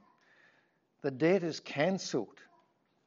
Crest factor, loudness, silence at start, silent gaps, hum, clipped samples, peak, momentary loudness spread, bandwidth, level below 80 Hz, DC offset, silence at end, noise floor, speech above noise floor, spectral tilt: 20 dB; -33 LUFS; 1.05 s; none; none; under 0.1%; -16 dBFS; 10 LU; 7.8 kHz; -86 dBFS; under 0.1%; 0.8 s; -72 dBFS; 40 dB; -5.5 dB/octave